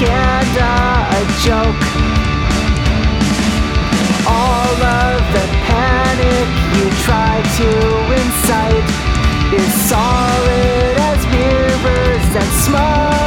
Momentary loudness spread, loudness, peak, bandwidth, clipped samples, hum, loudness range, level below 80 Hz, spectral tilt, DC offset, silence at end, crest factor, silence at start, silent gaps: 2 LU; -13 LUFS; -2 dBFS; 19 kHz; under 0.1%; none; 1 LU; -18 dBFS; -5 dB/octave; under 0.1%; 0 s; 12 dB; 0 s; none